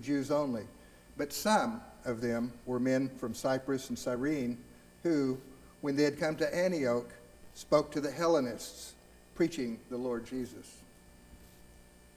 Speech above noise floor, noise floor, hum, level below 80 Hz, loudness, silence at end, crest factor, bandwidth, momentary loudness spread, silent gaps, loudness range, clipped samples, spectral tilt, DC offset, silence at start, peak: 25 dB; -57 dBFS; none; -62 dBFS; -33 LUFS; 0.35 s; 20 dB; 16 kHz; 15 LU; none; 4 LU; under 0.1%; -5 dB/octave; under 0.1%; 0 s; -14 dBFS